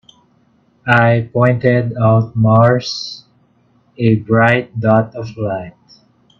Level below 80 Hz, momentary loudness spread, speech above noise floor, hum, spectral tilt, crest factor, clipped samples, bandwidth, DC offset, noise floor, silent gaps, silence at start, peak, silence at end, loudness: -50 dBFS; 14 LU; 42 dB; none; -7.5 dB/octave; 16 dB; under 0.1%; 6.8 kHz; under 0.1%; -55 dBFS; none; 0.85 s; 0 dBFS; 0.7 s; -14 LUFS